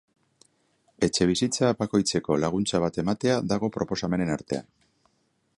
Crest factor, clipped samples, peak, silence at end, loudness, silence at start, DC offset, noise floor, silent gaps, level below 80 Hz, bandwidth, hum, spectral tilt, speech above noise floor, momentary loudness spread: 20 dB; under 0.1%; -8 dBFS; 0.95 s; -26 LUFS; 1 s; under 0.1%; -71 dBFS; none; -54 dBFS; 11.5 kHz; none; -5 dB/octave; 46 dB; 5 LU